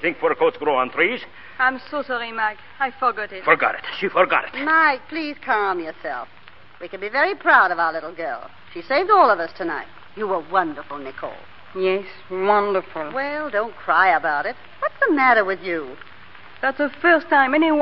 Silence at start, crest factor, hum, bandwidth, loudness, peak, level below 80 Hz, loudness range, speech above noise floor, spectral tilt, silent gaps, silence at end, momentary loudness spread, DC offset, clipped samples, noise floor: 0 s; 20 dB; none; 6 kHz; -20 LUFS; -2 dBFS; -62 dBFS; 4 LU; 24 dB; -7.5 dB/octave; none; 0 s; 16 LU; 0.8%; under 0.1%; -45 dBFS